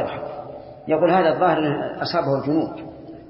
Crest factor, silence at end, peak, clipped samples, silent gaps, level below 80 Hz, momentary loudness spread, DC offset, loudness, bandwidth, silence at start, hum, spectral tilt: 16 dB; 0 s; -6 dBFS; under 0.1%; none; -56 dBFS; 19 LU; under 0.1%; -21 LUFS; 5.8 kHz; 0 s; none; -10.5 dB/octave